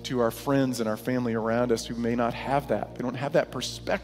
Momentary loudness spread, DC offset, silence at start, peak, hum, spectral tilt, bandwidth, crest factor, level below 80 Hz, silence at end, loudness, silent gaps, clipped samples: 6 LU; under 0.1%; 0 s; -10 dBFS; none; -5.5 dB/octave; 16 kHz; 16 dB; -50 dBFS; 0 s; -28 LUFS; none; under 0.1%